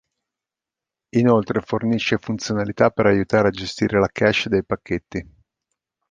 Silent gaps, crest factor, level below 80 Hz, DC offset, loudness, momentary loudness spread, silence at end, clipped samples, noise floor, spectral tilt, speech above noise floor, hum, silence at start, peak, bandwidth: none; 20 dB; -48 dBFS; under 0.1%; -20 LUFS; 8 LU; 0.9 s; under 0.1%; -88 dBFS; -6 dB/octave; 68 dB; none; 1.15 s; -2 dBFS; 9.2 kHz